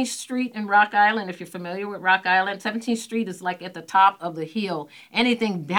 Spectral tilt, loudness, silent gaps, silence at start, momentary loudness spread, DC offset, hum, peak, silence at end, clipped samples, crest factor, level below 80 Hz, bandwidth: -4 dB/octave; -23 LUFS; none; 0 s; 13 LU; under 0.1%; none; -4 dBFS; 0 s; under 0.1%; 20 dB; -72 dBFS; 18.5 kHz